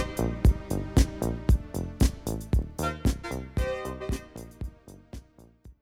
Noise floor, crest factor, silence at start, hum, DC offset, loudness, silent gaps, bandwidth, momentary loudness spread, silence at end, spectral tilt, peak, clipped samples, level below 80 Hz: -52 dBFS; 20 dB; 0 s; none; under 0.1%; -29 LUFS; none; 16.5 kHz; 16 LU; 0.1 s; -6.5 dB/octave; -8 dBFS; under 0.1%; -30 dBFS